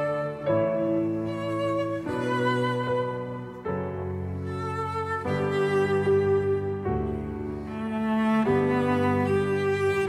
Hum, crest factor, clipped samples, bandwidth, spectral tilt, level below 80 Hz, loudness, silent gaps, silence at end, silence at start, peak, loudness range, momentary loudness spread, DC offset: none; 14 dB; under 0.1%; 11.5 kHz; -7.5 dB/octave; -50 dBFS; -27 LUFS; none; 0 s; 0 s; -12 dBFS; 3 LU; 9 LU; under 0.1%